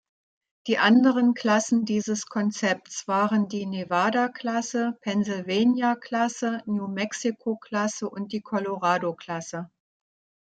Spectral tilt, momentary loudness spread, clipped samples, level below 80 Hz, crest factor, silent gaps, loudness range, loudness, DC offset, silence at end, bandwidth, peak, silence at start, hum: -4.5 dB/octave; 10 LU; under 0.1%; -72 dBFS; 18 dB; none; 5 LU; -25 LUFS; under 0.1%; 0.8 s; 9 kHz; -6 dBFS; 0.65 s; none